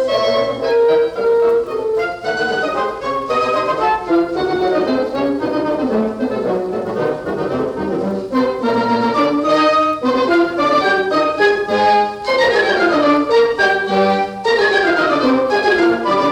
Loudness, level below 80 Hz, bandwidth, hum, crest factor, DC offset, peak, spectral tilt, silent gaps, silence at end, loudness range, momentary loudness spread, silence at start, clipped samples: -16 LUFS; -48 dBFS; 11.5 kHz; none; 14 dB; under 0.1%; -2 dBFS; -5 dB/octave; none; 0 s; 5 LU; 7 LU; 0 s; under 0.1%